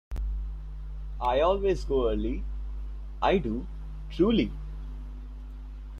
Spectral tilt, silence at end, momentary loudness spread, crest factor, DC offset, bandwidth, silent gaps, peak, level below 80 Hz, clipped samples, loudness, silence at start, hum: -7.5 dB/octave; 0 s; 18 LU; 18 dB; under 0.1%; 7.4 kHz; none; -10 dBFS; -36 dBFS; under 0.1%; -29 LUFS; 0.1 s; none